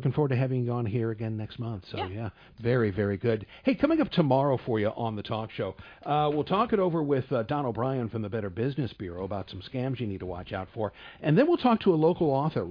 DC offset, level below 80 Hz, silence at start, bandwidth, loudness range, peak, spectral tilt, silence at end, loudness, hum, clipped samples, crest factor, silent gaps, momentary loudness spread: under 0.1%; -56 dBFS; 0 s; 5.2 kHz; 5 LU; -10 dBFS; -10 dB/octave; 0 s; -28 LUFS; none; under 0.1%; 18 dB; none; 12 LU